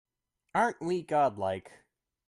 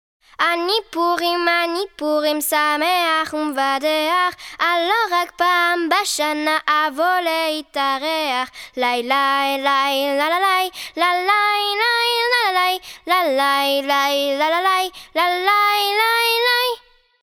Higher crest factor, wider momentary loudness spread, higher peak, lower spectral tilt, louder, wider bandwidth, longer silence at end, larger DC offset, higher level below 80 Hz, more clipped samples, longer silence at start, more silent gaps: about the same, 18 dB vs 16 dB; about the same, 7 LU vs 5 LU; second, -14 dBFS vs -4 dBFS; first, -6 dB/octave vs 0 dB/octave; second, -30 LUFS vs -18 LUFS; second, 11.5 kHz vs 19.5 kHz; first, 0.6 s vs 0.45 s; neither; second, -72 dBFS vs -60 dBFS; neither; first, 0.55 s vs 0.4 s; neither